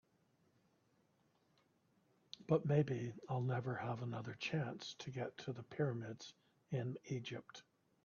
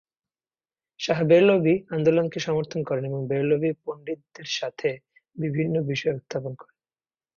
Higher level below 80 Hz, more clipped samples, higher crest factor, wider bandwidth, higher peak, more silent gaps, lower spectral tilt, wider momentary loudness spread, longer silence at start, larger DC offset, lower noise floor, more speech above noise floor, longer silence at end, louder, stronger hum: second, -80 dBFS vs -64 dBFS; neither; about the same, 20 dB vs 18 dB; about the same, 7 kHz vs 7.2 kHz; second, -22 dBFS vs -8 dBFS; neither; about the same, -6 dB/octave vs -6.5 dB/octave; about the same, 16 LU vs 16 LU; first, 2.4 s vs 1 s; neither; second, -77 dBFS vs under -90 dBFS; second, 36 dB vs over 66 dB; second, 0.45 s vs 0.75 s; second, -42 LUFS vs -24 LUFS; neither